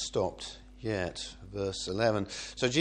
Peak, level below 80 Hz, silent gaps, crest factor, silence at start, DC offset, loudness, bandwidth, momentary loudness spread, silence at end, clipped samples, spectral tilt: -12 dBFS; -54 dBFS; none; 22 dB; 0 s; under 0.1%; -34 LUFS; 10.5 kHz; 12 LU; 0 s; under 0.1%; -4 dB/octave